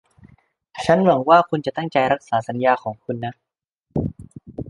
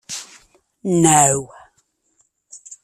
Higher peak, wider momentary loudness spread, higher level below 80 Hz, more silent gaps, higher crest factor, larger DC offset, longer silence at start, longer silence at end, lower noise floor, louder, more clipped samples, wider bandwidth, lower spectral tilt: about the same, -2 dBFS vs 0 dBFS; second, 15 LU vs 25 LU; first, -50 dBFS vs -56 dBFS; first, 3.72-3.84 s vs none; about the same, 20 dB vs 20 dB; neither; first, 0.75 s vs 0.1 s; about the same, 0 s vs 0.1 s; second, -53 dBFS vs -65 dBFS; second, -20 LUFS vs -15 LUFS; neither; second, 11 kHz vs 15 kHz; first, -7 dB/octave vs -4 dB/octave